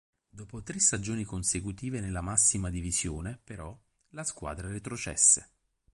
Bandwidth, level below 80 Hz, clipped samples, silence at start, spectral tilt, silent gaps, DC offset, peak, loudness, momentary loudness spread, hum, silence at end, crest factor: 11.5 kHz; -48 dBFS; under 0.1%; 0.35 s; -3 dB/octave; none; under 0.1%; -8 dBFS; -28 LUFS; 22 LU; none; 0.5 s; 24 dB